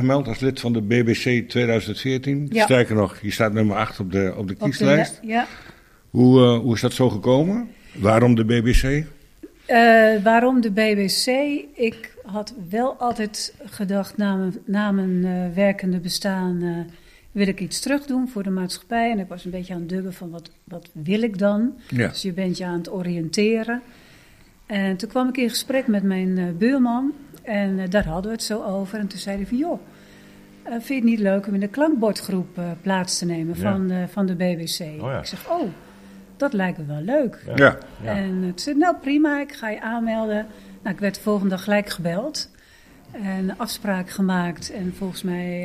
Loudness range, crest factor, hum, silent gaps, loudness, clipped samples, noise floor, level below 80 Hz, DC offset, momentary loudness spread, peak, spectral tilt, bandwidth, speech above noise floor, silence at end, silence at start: 7 LU; 22 dB; none; none; -22 LUFS; under 0.1%; -50 dBFS; -40 dBFS; under 0.1%; 13 LU; 0 dBFS; -5.5 dB/octave; 15.5 kHz; 29 dB; 0 s; 0 s